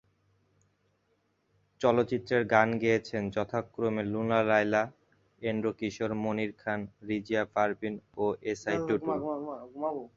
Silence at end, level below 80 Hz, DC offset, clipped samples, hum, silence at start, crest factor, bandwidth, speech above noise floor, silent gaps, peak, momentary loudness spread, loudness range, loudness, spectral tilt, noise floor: 0.1 s; -64 dBFS; under 0.1%; under 0.1%; none; 1.8 s; 24 dB; 7.6 kHz; 44 dB; none; -8 dBFS; 10 LU; 4 LU; -30 LUFS; -6.5 dB/octave; -74 dBFS